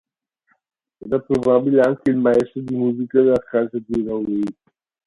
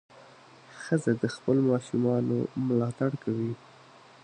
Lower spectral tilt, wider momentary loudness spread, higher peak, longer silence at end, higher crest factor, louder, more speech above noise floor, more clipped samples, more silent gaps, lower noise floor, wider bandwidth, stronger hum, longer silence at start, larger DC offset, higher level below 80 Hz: about the same, -8.5 dB/octave vs -7.5 dB/octave; about the same, 8 LU vs 7 LU; first, -2 dBFS vs -12 dBFS; second, 0.55 s vs 0.7 s; about the same, 18 dB vs 18 dB; first, -19 LUFS vs -28 LUFS; first, 48 dB vs 26 dB; neither; neither; first, -66 dBFS vs -54 dBFS; about the same, 11 kHz vs 10 kHz; neither; first, 1.05 s vs 0.15 s; neither; first, -54 dBFS vs -68 dBFS